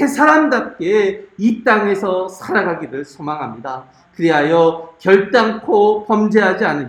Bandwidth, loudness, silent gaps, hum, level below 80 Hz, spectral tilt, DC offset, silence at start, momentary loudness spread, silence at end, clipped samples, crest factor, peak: 13.5 kHz; -15 LUFS; none; none; -60 dBFS; -6 dB/octave; under 0.1%; 0 s; 13 LU; 0 s; under 0.1%; 16 dB; 0 dBFS